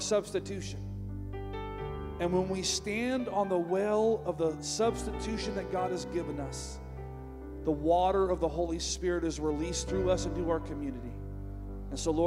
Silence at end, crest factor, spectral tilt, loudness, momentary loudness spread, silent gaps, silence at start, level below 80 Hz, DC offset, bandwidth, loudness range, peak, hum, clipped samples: 0 s; 16 dB; -5 dB/octave; -33 LUFS; 14 LU; none; 0 s; -44 dBFS; under 0.1%; 15.5 kHz; 4 LU; -16 dBFS; none; under 0.1%